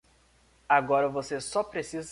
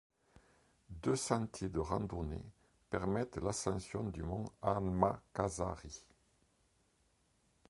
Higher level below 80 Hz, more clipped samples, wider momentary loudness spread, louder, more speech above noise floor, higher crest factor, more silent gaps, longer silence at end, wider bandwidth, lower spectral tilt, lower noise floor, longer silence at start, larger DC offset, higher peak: second, -62 dBFS vs -54 dBFS; neither; second, 10 LU vs 13 LU; first, -28 LUFS vs -39 LUFS; about the same, 35 dB vs 37 dB; second, 20 dB vs 26 dB; neither; second, 0 s vs 1.7 s; about the same, 11.5 kHz vs 11.5 kHz; second, -4 dB/octave vs -5.5 dB/octave; second, -63 dBFS vs -75 dBFS; second, 0.7 s vs 0.9 s; neither; first, -8 dBFS vs -14 dBFS